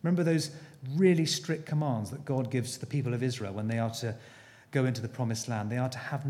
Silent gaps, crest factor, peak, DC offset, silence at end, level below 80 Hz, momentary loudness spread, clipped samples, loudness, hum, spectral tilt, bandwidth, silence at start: none; 18 dB; -12 dBFS; under 0.1%; 0 s; -72 dBFS; 9 LU; under 0.1%; -31 LUFS; none; -6 dB/octave; 15.5 kHz; 0.05 s